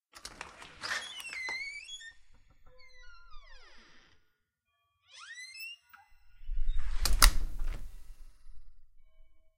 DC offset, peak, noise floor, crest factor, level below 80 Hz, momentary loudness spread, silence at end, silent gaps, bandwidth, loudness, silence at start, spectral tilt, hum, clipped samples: under 0.1%; -2 dBFS; -80 dBFS; 32 dB; -36 dBFS; 31 LU; 0.75 s; none; 16 kHz; -34 LUFS; 0.25 s; -1 dB/octave; none; under 0.1%